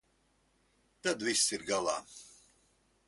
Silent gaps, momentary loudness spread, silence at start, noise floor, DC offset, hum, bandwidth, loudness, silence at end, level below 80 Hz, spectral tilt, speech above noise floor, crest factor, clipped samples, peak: none; 18 LU; 1.05 s; -73 dBFS; under 0.1%; none; 12 kHz; -32 LUFS; 0.8 s; -72 dBFS; -1 dB/octave; 39 dB; 24 dB; under 0.1%; -14 dBFS